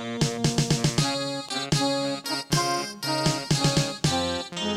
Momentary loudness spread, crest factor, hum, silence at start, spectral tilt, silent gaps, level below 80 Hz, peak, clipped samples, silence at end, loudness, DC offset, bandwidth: 6 LU; 16 dB; none; 0 s; -4 dB/octave; none; -50 dBFS; -10 dBFS; under 0.1%; 0 s; -25 LUFS; under 0.1%; 15.5 kHz